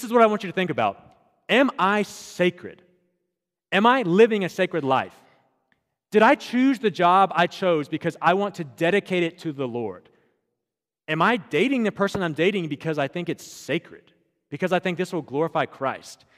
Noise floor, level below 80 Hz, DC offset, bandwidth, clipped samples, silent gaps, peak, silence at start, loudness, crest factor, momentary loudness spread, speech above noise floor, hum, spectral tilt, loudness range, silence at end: -87 dBFS; -68 dBFS; under 0.1%; 15 kHz; under 0.1%; none; -2 dBFS; 0 s; -22 LUFS; 20 dB; 11 LU; 64 dB; none; -5.5 dB/octave; 5 LU; 0.25 s